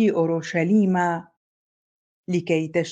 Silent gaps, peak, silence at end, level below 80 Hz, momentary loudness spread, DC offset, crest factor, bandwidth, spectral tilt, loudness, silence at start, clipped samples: 1.37-2.24 s; -8 dBFS; 0 s; -70 dBFS; 9 LU; under 0.1%; 16 dB; 8 kHz; -7 dB/octave; -22 LUFS; 0 s; under 0.1%